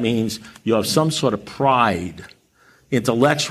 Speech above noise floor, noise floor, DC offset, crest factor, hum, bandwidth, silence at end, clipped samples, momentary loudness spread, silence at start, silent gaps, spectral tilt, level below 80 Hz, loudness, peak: 36 dB; -55 dBFS; under 0.1%; 18 dB; none; 15.5 kHz; 0 s; under 0.1%; 10 LU; 0 s; none; -5 dB/octave; -54 dBFS; -20 LUFS; -2 dBFS